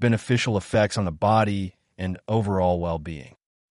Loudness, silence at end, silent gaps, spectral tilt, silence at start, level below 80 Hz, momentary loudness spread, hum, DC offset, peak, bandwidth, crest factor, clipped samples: -24 LUFS; 0.45 s; none; -6.5 dB/octave; 0 s; -48 dBFS; 12 LU; none; under 0.1%; -8 dBFS; 11.5 kHz; 16 dB; under 0.1%